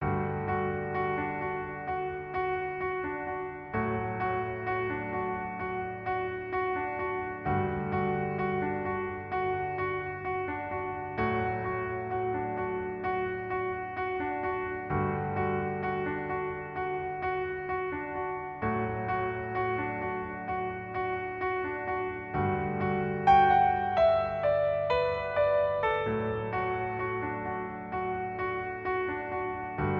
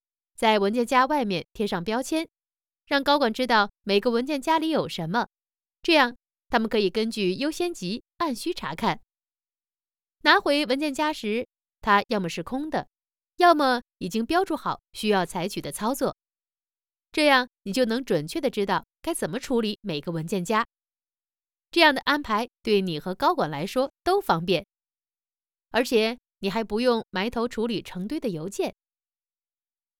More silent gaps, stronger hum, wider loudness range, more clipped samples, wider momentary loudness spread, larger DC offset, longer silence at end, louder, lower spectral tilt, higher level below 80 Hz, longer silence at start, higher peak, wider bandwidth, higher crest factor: neither; neither; first, 7 LU vs 4 LU; neither; second, 7 LU vs 11 LU; neither; second, 0 s vs 1.3 s; second, -31 LUFS vs -25 LUFS; first, -9 dB/octave vs -4.5 dB/octave; about the same, -52 dBFS vs -56 dBFS; second, 0 s vs 0.4 s; second, -10 dBFS vs -4 dBFS; second, 6 kHz vs 19 kHz; about the same, 20 dB vs 22 dB